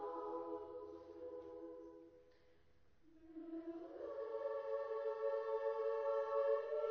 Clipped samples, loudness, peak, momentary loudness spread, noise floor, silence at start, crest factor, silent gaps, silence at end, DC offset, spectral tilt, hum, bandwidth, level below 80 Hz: under 0.1%; -44 LUFS; -28 dBFS; 16 LU; -74 dBFS; 0 s; 16 dB; none; 0 s; under 0.1%; -3.5 dB/octave; none; 6.4 kHz; -80 dBFS